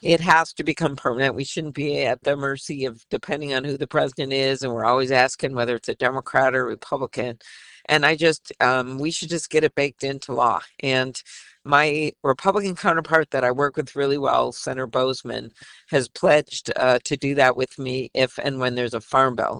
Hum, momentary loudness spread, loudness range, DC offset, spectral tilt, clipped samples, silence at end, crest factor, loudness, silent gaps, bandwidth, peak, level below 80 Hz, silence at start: none; 10 LU; 2 LU; under 0.1%; -4.5 dB/octave; under 0.1%; 0 s; 20 dB; -22 LUFS; none; 11.5 kHz; -2 dBFS; -58 dBFS; 0.05 s